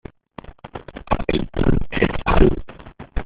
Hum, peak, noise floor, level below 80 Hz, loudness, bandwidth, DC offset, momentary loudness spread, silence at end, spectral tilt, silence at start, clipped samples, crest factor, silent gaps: none; -2 dBFS; -40 dBFS; -26 dBFS; -21 LUFS; 4.9 kHz; under 0.1%; 23 LU; 0 s; -6 dB/octave; 0.65 s; under 0.1%; 18 dB; none